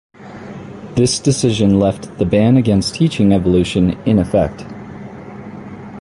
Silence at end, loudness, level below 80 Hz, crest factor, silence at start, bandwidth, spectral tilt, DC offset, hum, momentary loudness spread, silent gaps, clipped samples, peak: 0 s; -15 LUFS; -36 dBFS; 14 dB; 0.2 s; 11.5 kHz; -6 dB/octave; under 0.1%; none; 20 LU; none; under 0.1%; -2 dBFS